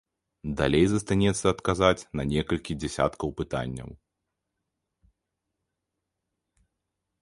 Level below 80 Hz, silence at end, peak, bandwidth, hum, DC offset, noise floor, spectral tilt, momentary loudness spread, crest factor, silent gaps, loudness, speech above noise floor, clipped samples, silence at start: -46 dBFS; 3.25 s; -6 dBFS; 11.5 kHz; none; under 0.1%; -84 dBFS; -5.5 dB/octave; 12 LU; 22 dB; none; -26 LUFS; 58 dB; under 0.1%; 0.45 s